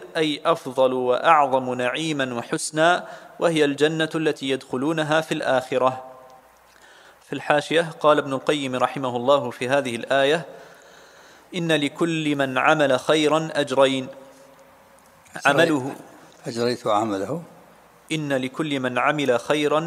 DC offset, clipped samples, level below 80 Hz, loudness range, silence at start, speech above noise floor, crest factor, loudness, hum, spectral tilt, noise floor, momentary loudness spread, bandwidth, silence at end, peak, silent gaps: under 0.1%; under 0.1%; -70 dBFS; 4 LU; 0 s; 30 dB; 22 dB; -22 LUFS; none; -4.5 dB/octave; -52 dBFS; 9 LU; 15.5 kHz; 0 s; -2 dBFS; none